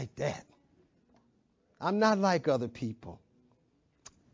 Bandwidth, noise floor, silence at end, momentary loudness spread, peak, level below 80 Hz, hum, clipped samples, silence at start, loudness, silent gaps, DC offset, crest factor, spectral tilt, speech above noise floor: 7.6 kHz; -71 dBFS; 1.2 s; 20 LU; -12 dBFS; -66 dBFS; none; under 0.1%; 0 s; -31 LUFS; none; under 0.1%; 22 dB; -6 dB/octave; 41 dB